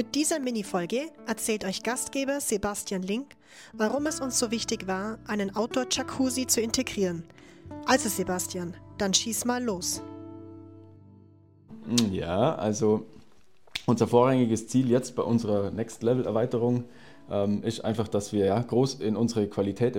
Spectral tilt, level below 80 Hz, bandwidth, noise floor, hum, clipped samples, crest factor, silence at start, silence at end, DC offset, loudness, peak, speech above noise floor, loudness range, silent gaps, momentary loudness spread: -4.5 dB/octave; -58 dBFS; 16.5 kHz; -62 dBFS; none; under 0.1%; 20 dB; 0 s; 0 s; under 0.1%; -27 LUFS; -8 dBFS; 35 dB; 4 LU; none; 9 LU